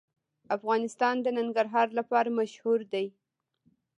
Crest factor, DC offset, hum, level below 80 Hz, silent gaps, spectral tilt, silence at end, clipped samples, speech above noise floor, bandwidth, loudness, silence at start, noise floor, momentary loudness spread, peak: 18 dB; under 0.1%; none; -86 dBFS; none; -5 dB/octave; 0.9 s; under 0.1%; 43 dB; 10.5 kHz; -29 LUFS; 0.5 s; -71 dBFS; 7 LU; -12 dBFS